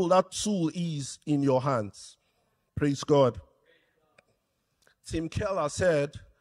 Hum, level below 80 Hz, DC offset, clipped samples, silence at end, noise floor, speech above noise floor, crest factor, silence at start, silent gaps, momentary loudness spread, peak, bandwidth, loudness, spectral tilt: none; -54 dBFS; under 0.1%; under 0.1%; 0.25 s; -76 dBFS; 49 dB; 20 dB; 0 s; none; 18 LU; -10 dBFS; 12.5 kHz; -28 LUFS; -5.5 dB/octave